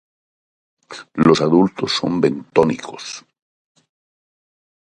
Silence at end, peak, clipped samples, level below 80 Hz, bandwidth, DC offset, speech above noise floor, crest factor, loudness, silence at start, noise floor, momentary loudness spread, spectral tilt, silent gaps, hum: 1.65 s; 0 dBFS; under 0.1%; -54 dBFS; 10.5 kHz; under 0.1%; over 73 dB; 20 dB; -17 LUFS; 0.9 s; under -90 dBFS; 19 LU; -5.5 dB/octave; none; none